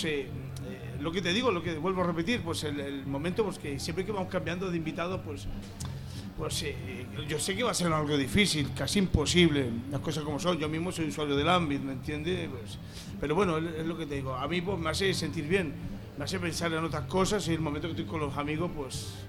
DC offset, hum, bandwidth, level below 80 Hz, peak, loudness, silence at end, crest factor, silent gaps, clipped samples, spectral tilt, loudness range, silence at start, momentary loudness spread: under 0.1%; none; 16.5 kHz; -48 dBFS; -10 dBFS; -31 LUFS; 0 s; 22 dB; none; under 0.1%; -5 dB/octave; 6 LU; 0 s; 13 LU